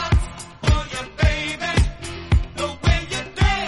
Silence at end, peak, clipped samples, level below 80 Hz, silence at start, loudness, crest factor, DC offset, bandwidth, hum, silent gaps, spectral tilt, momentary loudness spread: 0 s; -2 dBFS; under 0.1%; -24 dBFS; 0 s; -22 LUFS; 18 dB; under 0.1%; 11.5 kHz; none; none; -5 dB/octave; 7 LU